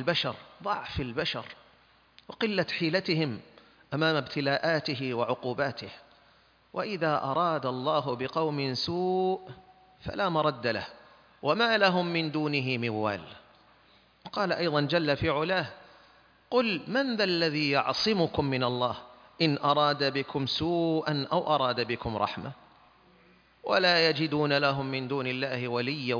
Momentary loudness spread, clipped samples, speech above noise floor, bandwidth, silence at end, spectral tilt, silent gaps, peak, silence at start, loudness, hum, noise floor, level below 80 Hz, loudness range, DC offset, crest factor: 11 LU; under 0.1%; 34 dB; 5.4 kHz; 0 s; -6 dB/octave; none; -10 dBFS; 0 s; -28 LUFS; none; -62 dBFS; -60 dBFS; 3 LU; under 0.1%; 20 dB